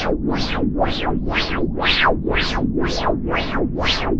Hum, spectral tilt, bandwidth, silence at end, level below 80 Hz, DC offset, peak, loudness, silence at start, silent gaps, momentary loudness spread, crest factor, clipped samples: none; -5.5 dB/octave; 7.8 kHz; 0 s; -28 dBFS; under 0.1%; -4 dBFS; -20 LUFS; 0 s; none; 5 LU; 16 dB; under 0.1%